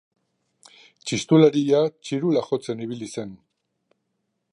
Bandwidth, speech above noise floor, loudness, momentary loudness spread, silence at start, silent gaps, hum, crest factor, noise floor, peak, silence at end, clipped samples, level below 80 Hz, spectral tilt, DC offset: 11 kHz; 55 dB; -22 LUFS; 17 LU; 1.05 s; none; none; 20 dB; -76 dBFS; -4 dBFS; 1.15 s; under 0.1%; -68 dBFS; -6 dB/octave; under 0.1%